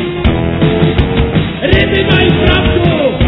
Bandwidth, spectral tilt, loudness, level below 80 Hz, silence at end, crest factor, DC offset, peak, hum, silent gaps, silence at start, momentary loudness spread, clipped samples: 5.4 kHz; -9.5 dB/octave; -11 LUFS; -20 dBFS; 0 s; 10 dB; under 0.1%; 0 dBFS; none; none; 0 s; 4 LU; 0.4%